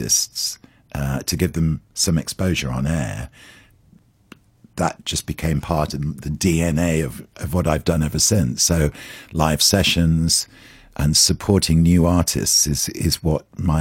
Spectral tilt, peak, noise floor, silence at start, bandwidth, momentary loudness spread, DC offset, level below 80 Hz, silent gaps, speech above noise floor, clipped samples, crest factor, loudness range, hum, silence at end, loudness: -4 dB/octave; 0 dBFS; -54 dBFS; 0 s; 16.5 kHz; 12 LU; under 0.1%; -34 dBFS; none; 34 dB; under 0.1%; 20 dB; 9 LU; none; 0 s; -19 LUFS